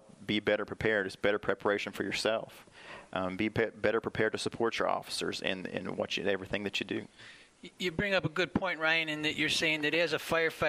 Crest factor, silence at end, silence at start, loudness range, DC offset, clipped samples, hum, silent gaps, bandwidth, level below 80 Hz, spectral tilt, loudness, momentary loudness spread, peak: 22 dB; 0 s; 0.2 s; 4 LU; under 0.1%; under 0.1%; none; none; 15.5 kHz; -62 dBFS; -4 dB/octave; -32 LUFS; 10 LU; -12 dBFS